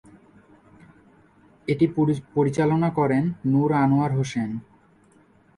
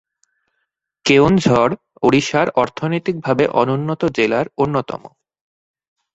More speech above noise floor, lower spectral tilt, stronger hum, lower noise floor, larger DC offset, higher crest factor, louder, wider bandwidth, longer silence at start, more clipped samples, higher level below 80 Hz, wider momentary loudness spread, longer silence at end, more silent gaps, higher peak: second, 35 dB vs 58 dB; first, -8 dB/octave vs -6 dB/octave; neither; second, -57 dBFS vs -74 dBFS; neither; about the same, 16 dB vs 18 dB; second, -23 LUFS vs -17 LUFS; first, 11 kHz vs 8.2 kHz; first, 1.7 s vs 1.05 s; neither; second, -58 dBFS vs -48 dBFS; about the same, 9 LU vs 8 LU; about the same, 0.95 s vs 1.05 s; neither; second, -8 dBFS vs 0 dBFS